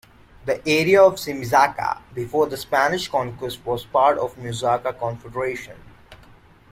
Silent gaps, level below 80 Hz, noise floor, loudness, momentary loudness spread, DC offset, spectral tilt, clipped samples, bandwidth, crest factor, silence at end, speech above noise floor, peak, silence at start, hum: none; -52 dBFS; -49 dBFS; -21 LUFS; 13 LU; under 0.1%; -4.5 dB/octave; under 0.1%; 16.5 kHz; 20 dB; 0.55 s; 29 dB; -2 dBFS; 0.45 s; none